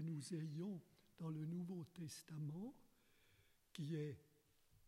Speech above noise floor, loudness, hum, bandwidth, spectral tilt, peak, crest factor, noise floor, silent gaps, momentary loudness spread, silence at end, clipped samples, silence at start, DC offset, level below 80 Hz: 26 dB; -50 LUFS; none; 15.5 kHz; -6.5 dB/octave; -34 dBFS; 16 dB; -76 dBFS; none; 8 LU; 0 s; under 0.1%; 0 s; under 0.1%; -84 dBFS